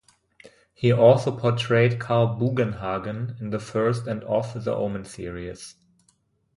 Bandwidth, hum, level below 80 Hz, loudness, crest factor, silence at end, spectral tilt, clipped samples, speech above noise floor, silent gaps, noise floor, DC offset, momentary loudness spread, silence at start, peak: 11.5 kHz; none; -54 dBFS; -23 LUFS; 20 dB; 0.85 s; -7 dB/octave; under 0.1%; 43 dB; none; -66 dBFS; under 0.1%; 16 LU; 0.45 s; -4 dBFS